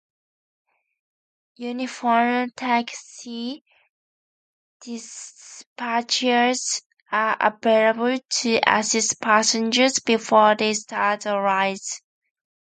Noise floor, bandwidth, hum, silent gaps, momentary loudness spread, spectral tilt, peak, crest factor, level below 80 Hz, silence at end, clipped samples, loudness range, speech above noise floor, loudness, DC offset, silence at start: under -90 dBFS; 9.6 kHz; none; 3.61-3.65 s, 3.89-4.80 s, 5.66-5.76 s, 6.86-6.90 s, 7.02-7.06 s; 17 LU; -2 dB/octave; 0 dBFS; 22 dB; -72 dBFS; 0.65 s; under 0.1%; 10 LU; over 68 dB; -21 LUFS; under 0.1%; 1.6 s